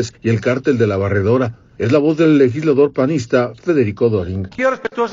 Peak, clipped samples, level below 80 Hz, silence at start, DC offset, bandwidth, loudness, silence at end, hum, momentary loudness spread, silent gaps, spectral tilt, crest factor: 0 dBFS; under 0.1%; -50 dBFS; 0 s; under 0.1%; 7.6 kHz; -16 LUFS; 0 s; none; 6 LU; none; -7.5 dB/octave; 14 dB